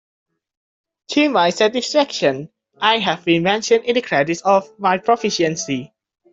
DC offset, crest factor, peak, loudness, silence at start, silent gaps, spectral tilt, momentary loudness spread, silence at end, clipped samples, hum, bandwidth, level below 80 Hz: under 0.1%; 16 dB; -2 dBFS; -18 LUFS; 1.1 s; none; -4 dB/octave; 5 LU; 0.45 s; under 0.1%; none; 8 kHz; -62 dBFS